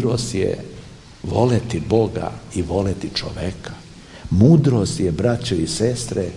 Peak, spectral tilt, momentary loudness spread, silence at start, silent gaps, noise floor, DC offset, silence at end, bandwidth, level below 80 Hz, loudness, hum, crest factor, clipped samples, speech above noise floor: 0 dBFS; -6.5 dB/octave; 20 LU; 0 s; none; -40 dBFS; under 0.1%; 0 s; 11.5 kHz; -42 dBFS; -20 LUFS; none; 18 dB; under 0.1%; 21 dB